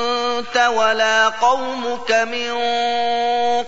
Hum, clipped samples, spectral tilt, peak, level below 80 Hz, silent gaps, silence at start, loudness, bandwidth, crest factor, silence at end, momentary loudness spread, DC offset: 50 Hz at -60 dBFS; under 0.1%; -1 dB/octave; -4 dBFS; -58 dBFS; none; 0 s; -18 LUFS; 8 kHz; 14 dB; 0 s; 6 LU; 2%